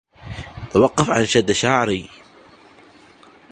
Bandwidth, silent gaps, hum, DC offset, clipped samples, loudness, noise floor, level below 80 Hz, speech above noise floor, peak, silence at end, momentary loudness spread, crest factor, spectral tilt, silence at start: 10.5 kHz; none; none; under 0.1%; under 0.1%; -18 LUFS; -48 dBFS; -46 dBFS; 31 dB; 0 dBFS; 1.5 s; 18 LU; 20 dB; -4.5 dB/octave; 0.25 s